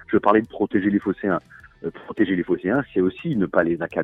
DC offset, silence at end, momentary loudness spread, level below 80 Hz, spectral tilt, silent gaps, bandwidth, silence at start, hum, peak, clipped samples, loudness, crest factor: under 0.1%; 0 s; 11 LU; -54 dBFS; -9.5 dB/octave; none; 4 kHz; 0 s; none; -4 dBFS; under 0.1%; -22 LUFS; 18 dB